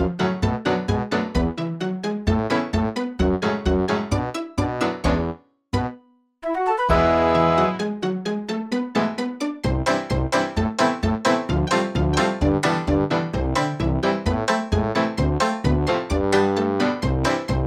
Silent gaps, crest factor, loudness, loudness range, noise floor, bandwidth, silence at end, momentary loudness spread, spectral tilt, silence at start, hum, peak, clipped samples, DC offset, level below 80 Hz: none; 18 dB; -22 LUFS; 2 LU; -50 dBFS; 13.5 kHz; 0 s; 7 LU; -6 dB/octave; 0 s; none; -4 dBFS; under 0.1%; under 0.1%; -34 dBFS